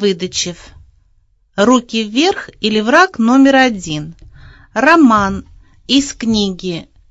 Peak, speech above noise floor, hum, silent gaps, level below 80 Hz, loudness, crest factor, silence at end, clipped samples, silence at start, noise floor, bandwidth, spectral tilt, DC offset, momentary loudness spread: 0 dBFS; 41 dB; none; none; -42 dBFS; -13 LUFS; 14 dB; 0.3 s; under 0.1%; 0 s; -54 dBFS; 8 kHz; -4 dB/octave; under 0.1%; 15 LU